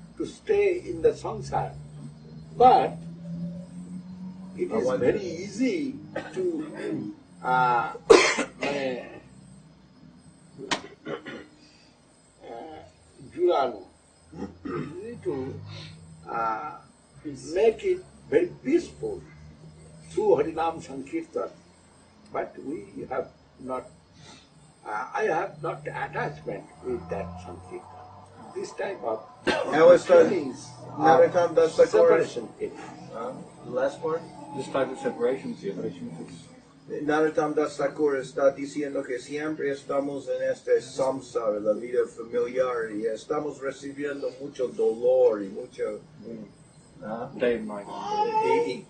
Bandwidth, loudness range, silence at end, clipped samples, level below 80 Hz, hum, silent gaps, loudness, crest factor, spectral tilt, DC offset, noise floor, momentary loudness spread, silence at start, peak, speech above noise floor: 9.4 kHz; 12 LU; 0.05 s; under 0.1%; -60 dBFS; none; none; -26 LUFS; 26 dB; -5 dB/octave; under 0.1%; -58 dBFS; 21 LU; 0 s; 0 dBFS; 32 dB